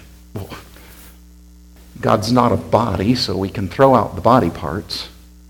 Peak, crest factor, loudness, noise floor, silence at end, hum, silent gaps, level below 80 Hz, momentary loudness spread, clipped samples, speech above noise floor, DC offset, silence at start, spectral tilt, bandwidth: 0 dBFS; 18 dB; -17 LUFS; -43 dBFS; 0.4 s; none; none; -42 dBFS; 20 LU; under 0.1%; 27 dB; under 0.1%; 0.35 s; -6.5 dB/octave; 18 kHz